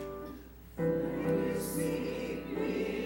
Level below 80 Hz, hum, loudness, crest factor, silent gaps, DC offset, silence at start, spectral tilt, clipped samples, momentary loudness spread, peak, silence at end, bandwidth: -54 dBFS; none; -34 LUFS; 14 dB; none; under 0.1%; 0 s; -6 dB/octave; under 0.1%; 13 LU; -20 dBFS; 0 s; 17 kHz